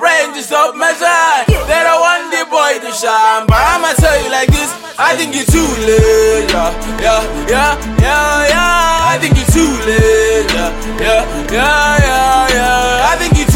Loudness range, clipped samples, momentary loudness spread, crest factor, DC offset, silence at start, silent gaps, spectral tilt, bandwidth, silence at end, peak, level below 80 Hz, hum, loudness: 1 LU; under 0.1%; 5 LU; 10 dB; under 0.1%; 0 s; none; -4 dB/octave; 17 kHz; 0 s; 0 dBFS; -20 dBFS; none; -11 LUFS